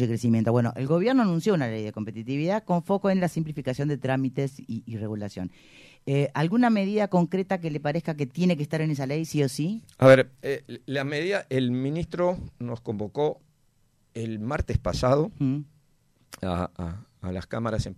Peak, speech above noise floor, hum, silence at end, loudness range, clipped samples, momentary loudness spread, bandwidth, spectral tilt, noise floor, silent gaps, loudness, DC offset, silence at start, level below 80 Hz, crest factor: -6 dBFS; 40 dB; none; 0.05 s; 6 LU; under 0.1%; 12 LU; 14 kHz; -7 dB/octave; -65 dBFS; none; -26 LUFS; under 0.1%; 0 s; -48 dBFS; 20 dB